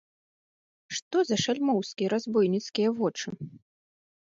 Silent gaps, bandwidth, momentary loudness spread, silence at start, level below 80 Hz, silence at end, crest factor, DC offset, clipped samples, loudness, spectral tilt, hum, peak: 1.02-1.11 s; 7.8 kHz; 11 LU; 0.9 s; -74 dBFS; 0.75 s; 16 dB; under 0.1%; under 0.1%; -28 LUFS; -4.5 dB/octave; none; -14 dBFS